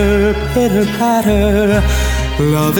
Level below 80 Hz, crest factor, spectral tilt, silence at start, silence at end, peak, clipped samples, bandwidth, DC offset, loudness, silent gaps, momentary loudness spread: -20 dBFS; 12 dB; -6 dB/octave; 0 s; 0 s; 0 dBFS; under 0.1%; 19 kHz; under 0.1%; -14 LUFS; none; 3 LU